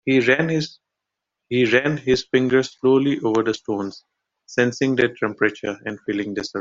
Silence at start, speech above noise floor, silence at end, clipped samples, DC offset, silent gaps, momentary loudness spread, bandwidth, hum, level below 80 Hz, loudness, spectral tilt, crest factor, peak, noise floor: 0.05 s; 63 dB; 0 s; under 0.1%; under 0.1%; none; 10 LU; 7.6 kHz; none; -56 dBFS; -21 LUFS; -5.5 dB/octave; 18 dB; -2 dBFS; -83 dBFS